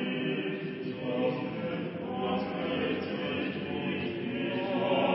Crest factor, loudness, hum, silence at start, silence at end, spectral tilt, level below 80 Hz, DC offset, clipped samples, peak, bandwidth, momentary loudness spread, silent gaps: 16 dB; -33 LUFS; none; 0 s; 0 s; -4.5 dB/octave; -62 dBFS; under 0.1%; under 0.1%; -16 dBFS; 5.6 kHz; 4 LU; none